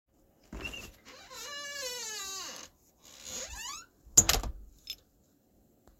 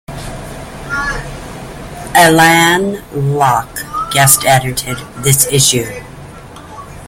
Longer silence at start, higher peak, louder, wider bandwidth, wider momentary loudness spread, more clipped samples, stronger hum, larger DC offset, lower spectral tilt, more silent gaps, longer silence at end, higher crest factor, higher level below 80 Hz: first, 0.5 s vs 0.1 s; second, -4 dBFS vs 0 dBFS; second, -31 LUFS vs -11 LUFS; second, 16.5 kHz vs over 20 kHz; first, 25 LU vs 21 LU; second, under 0.1% vs 0.1%; neither; neither; second, -0.5 dB/octave vs -3 dB/octave; neither; about the same, 0.1 s vs 0 s; first, 32 dB vs 14 dB; second, -48 dBFS vs -36 dBFS